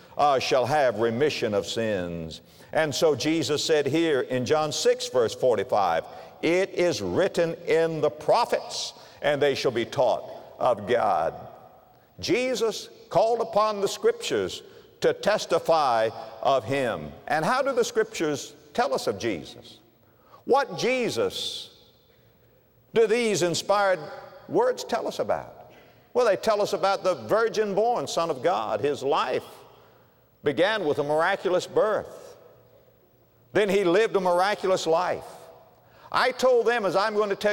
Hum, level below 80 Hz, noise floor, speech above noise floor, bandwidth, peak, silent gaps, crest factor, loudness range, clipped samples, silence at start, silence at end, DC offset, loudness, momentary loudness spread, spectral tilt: none; -64 dBFS; -60 dBFS; 35 dB; 16.5 kHz; -10 dBFS; none; 16 dB; 3 LU; under 0.1%; 0.1 s; 0 s; under 0.1%; -25 LUFS; 9 LU; -4 dB/octave